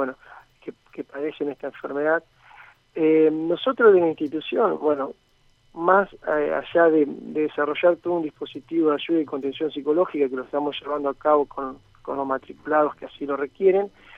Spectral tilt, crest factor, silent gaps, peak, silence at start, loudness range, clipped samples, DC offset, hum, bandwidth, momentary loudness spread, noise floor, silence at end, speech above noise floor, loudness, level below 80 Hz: -7.5 dB/octave; 20 dB; none; -4 dBFS; 0 s; 4 LU; under 0.1%; under 0.1%; none; 4.2 kHz; 15 LU; -60 dBFS; 0.3 s; 37 dB; -23 LUFS; -62 dBFS